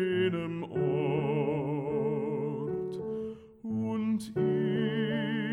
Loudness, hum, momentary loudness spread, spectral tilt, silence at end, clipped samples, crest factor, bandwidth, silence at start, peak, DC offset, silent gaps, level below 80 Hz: -31 LUFS; none; 7 LU; -8 dB/octave; 0 s; under 0.1%; 14 dB; 12 kHz; 0 s; -16 dBFS; under 0.1%; none; -64 dBFS